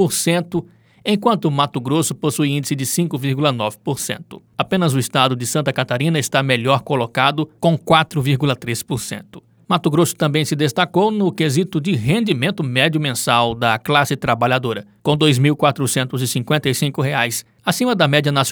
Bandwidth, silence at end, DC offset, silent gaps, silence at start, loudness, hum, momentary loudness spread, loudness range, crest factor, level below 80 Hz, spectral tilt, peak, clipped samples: over 20 kHz; 0 s; under 0.1%; none; 0 s; -18 LUFS; none; 8 LU; 2 LU; 18 dB; -54 dBFS; -4.5 dB/octave; 0 dBFS; under 0.1%